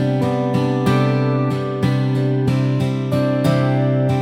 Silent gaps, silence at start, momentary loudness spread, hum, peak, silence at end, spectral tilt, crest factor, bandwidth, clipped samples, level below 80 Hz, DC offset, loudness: none; 0 s; 3 LU; none; -4 dBFS; 0 s; -8 dB/octave; 12 dB; 10.5 kHz; under 0.1%; -50 dBFS; under 0.1%; -18 LUFS